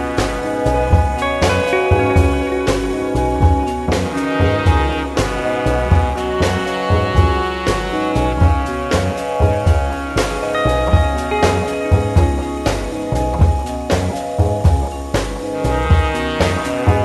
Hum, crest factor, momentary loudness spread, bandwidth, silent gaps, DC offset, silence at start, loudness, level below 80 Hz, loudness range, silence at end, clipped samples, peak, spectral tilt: none; 16 dB; 5 LU; 12.5 kHz; none; under 0.1%; 0 s; -17 LUFS; -22 dBFS; 2 LU; 0 s; under 0.1%; 0 dBFS; -6 dB/octave